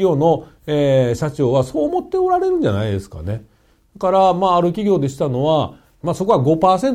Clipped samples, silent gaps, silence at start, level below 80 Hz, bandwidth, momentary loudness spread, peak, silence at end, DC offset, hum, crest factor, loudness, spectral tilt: under 0.1%; none; 0 s; -44 dBFS; 15 kHz; 11 LU; -2 dBFS; 0 s; under 0.1%; none; 14 dB; -17 LUFS; -7.5 dB/octave